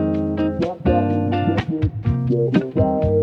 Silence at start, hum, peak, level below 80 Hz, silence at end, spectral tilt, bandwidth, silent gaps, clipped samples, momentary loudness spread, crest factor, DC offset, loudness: 0 s; none; -2 dBFS; -34 dBFS; 0 s; -9.5 dB/octave; 6.4 kHz; none; under 0.1%; 4 LU; 16 dB; under 0.1%; -20 LUFS